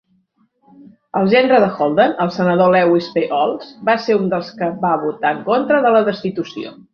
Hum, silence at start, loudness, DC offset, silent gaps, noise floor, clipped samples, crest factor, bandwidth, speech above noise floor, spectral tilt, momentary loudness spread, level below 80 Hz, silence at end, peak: none; 1.15 s; -16 LUFS; under 0.1%; none; -61 dBFS; under 0.1%; 16 dB; 6.6 kHz; 45 dB; -7.5 dB/octave; 11 LU; -60 dBFS; 0.2 s; -2 dBFS